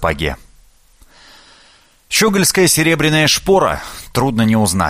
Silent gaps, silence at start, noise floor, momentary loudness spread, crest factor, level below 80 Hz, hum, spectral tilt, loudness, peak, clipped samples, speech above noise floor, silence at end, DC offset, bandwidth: none; 0 s; -49 dBFS; 11 LU; 16 dB; -36 dBFS; none; -3.5 dB/octave; -14 LUFS; 0 dBFS; under 0.1%; 35 dB; 0 s; under 0.1%; 15.5 kHz